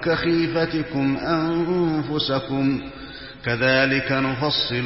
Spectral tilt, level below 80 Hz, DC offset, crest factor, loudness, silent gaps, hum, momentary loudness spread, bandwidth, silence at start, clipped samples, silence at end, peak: -9 dB/octave; -48 dBFS; 0.2%; 16 dB; -22 LUFS; none; none; 9 LU; 5.8 kHz; 0 s; under 0.1%; 0 s; -6 dBFS